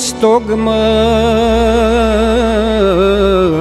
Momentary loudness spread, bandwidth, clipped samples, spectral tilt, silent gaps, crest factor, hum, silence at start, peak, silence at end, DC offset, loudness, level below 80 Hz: 2 LU; 13 kHz; under 0.1%; -5 dB/octave; none; 10 dB; none; 0 s; 0 dBFS; 0 s; under 0.1%; -11 LUFS; -22 dBFS